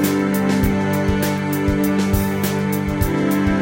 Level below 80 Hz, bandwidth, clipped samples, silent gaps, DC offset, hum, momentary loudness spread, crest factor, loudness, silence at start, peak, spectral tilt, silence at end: -32 dBFS; 17 kHz; under 0.1%; none; under 0.1%; none; 2 LU; 14 dB; -19 LUFS; 0 s; -4 dBFS; -6 dB/octave; 0 s